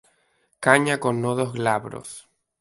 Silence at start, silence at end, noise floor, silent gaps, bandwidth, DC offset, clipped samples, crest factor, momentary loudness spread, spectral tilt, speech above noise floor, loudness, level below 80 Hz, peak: 0.6 s; 0.4 s; -67 dBFS; none; 12 kHz; under 0.1%; under 0.1%; 24 dB; 19 LU; -5 dB/octave; 44 dB; -22 LUFS; -64 dBFS; 0 dBFS